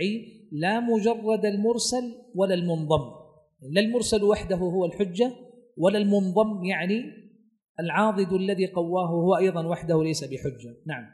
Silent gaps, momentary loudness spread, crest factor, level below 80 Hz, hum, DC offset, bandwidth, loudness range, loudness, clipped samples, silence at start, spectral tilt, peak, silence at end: 7.69-7.75 s; 11 LU; 18 dB; -54 dBFS; none; under 0.1%; 12 kHz; 1 LU; -25 LUFS; under 0.1%; 0 s; -5.5 dB/octave; -8 dBFS; 0.05 s